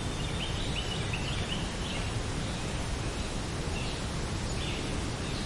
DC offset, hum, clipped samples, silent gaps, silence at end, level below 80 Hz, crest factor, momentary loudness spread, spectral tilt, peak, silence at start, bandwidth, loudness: under 0.1%; none; under 0.1%; none; 0 s; -38 dBFS; 14 dB; 2 LU; -4.5 dB/octave; -20 dBFS; 0 s; 11.5 kHz; -34 LUFS